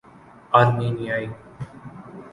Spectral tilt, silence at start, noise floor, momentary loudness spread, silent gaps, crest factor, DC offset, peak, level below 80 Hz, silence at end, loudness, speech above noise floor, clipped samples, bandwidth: -8 dB/octave; 0.5 s; -48 dBFS; 23 LU; none; 22 dB; under 0.1%; -2 dBFS; -56 dBFS; 0.05 s; -21 LUFS; 27 dB; under 0.1%; 11 kHz